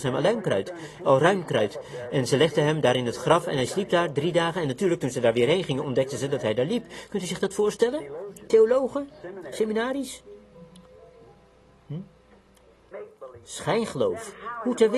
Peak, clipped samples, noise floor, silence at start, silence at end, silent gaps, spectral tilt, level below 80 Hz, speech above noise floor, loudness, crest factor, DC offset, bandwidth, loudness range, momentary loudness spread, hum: -4 dBFS; under 0.1%; -57 dBFS; 0 s; 0 s; none; -5.5 dB/octave; -60 dBFS; 32 dB; -25 LUFS; 22 dB; under 0.1%; 12.5 kHz; 11 LU; 17 LU; none